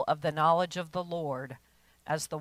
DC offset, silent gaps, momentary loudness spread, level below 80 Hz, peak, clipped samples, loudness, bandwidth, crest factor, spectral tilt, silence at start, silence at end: under 0.1%; none; 19 LU; -68 dBFS; -12 dBFS; under 0.1%; -31 LUFS; 16 kHz; 18 dB; -5 dB/octave; 0 s; 0 s